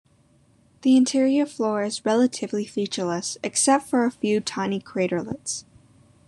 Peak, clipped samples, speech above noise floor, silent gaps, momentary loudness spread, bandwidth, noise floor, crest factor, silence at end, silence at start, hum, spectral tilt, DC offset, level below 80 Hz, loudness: -6 dBFS; under 0.1%; 37 dB; none; 9 LU; 12 kHz; -59 dBFS; 18 dB; 0.65 s; 0.85 s; none; -4 dB/octave; under 0.1%; -68 dBFS; -23 LUFS